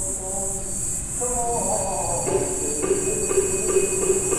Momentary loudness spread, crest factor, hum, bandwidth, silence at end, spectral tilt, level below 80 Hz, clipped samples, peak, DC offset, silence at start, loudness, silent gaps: 4 LU; 16 dB; none; 16 kHz; 0 s; -3.5 dB/octave; -38 dBFS; under 0.1%; -6 dBFS; 0.1%; 0 s; -22 LUFS; none